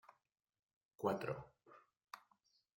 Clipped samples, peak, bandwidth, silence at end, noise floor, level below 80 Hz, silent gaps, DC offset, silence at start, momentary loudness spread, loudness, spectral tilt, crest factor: under 0.1%; -24 dBFS; 16.5 kHz; 0.6 s; -79 dBFS; -80 dBFS; none; under 0.1%; 1 s; 24 LU; -44 LUFS; -7 dB/octave; 26 dB